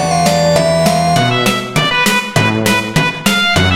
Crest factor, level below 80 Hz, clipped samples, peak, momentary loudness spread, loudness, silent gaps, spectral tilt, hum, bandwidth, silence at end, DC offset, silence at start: 12 dB; -40 dBFS; under 0.1%; 0 dBFS; 3 LU; -12 LUFS; none; -4 dB/octave; none; 17 kHz; 0 s; under 0.1%; 0 s